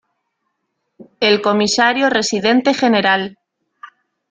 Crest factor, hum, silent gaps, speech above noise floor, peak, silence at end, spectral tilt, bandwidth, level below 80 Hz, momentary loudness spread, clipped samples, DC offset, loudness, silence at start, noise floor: 16 dB; none; none; 58 dB; -2 dBFS; 0.45 s; -3.5 dB/octave; 9.6 kHz; -62 dBFS; 4 LU; under 0.1%; under 0.1%; -14 LUFS; 1 s; -72 dBFS